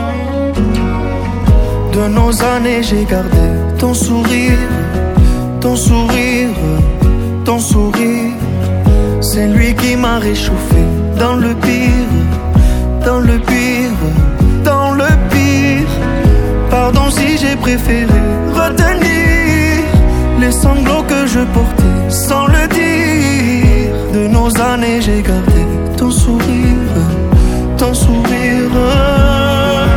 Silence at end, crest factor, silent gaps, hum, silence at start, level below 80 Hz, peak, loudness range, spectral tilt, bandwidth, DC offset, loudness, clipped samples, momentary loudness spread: 0 s; 10 dB; none; none; 0 s; -16 dBFS; 0 dBFS; 1 LU; -6 dB/octave; 17.5 kHz; under 0.1%; -12 LUFS; under 0.1%; 4 LU